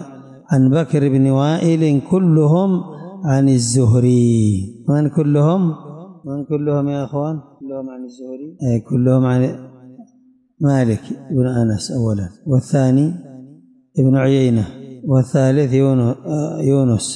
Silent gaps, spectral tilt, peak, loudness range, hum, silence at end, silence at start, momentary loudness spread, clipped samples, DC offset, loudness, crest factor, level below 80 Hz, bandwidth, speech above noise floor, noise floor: none; -7.5 dB/octave; -6 dBFS; 6 LU; none; 0 s; 0 s; 15 LU; under 0.1%; under 0.1%; -16 LUFS; 12 dB; -54 dBFS; 11.5 kHz; 38 dB; -53 dBFS